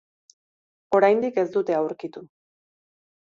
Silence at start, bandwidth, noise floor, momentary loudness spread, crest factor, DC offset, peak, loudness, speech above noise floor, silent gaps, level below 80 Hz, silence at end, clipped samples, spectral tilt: 0.9 s; 7.4 kHz; under -90 dBFS; 18 LU; 20 dB; under 0.1%; -4 dBFS; -22 LUFS; over 68 dB; none; -72 dBFS; 1 s; under 0.1%; -7 dB/octave